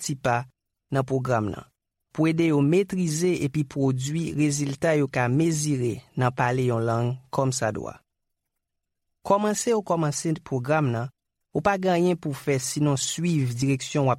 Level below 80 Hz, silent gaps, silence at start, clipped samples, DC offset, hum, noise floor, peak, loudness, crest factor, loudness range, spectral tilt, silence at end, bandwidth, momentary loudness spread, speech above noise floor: -58 dBFS; none; 0 s; under 0.1%; under 0.1%; none; -81 dBFS; -8 dBFS; -25 LUFS; 18 dB; 3 LU; -5.5 dB/octave; 0 s; 15.5 kHz; 7 LU; 57 dB